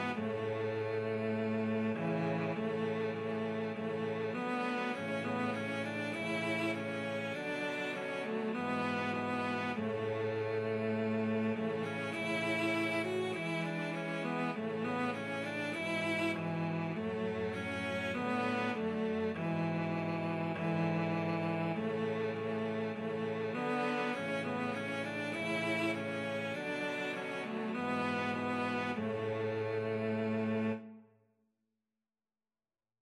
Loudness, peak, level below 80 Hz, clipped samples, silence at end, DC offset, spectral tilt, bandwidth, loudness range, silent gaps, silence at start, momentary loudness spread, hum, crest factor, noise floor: -36 LUFS; -22 dBFS; -78 dBFS; under 0.1%; 2 s; under 0.1%; -6.5 dB/octave; 13 kHz; 1 LU; none; 0 s; 4 LU; none; 14 dB; under -90 dBFS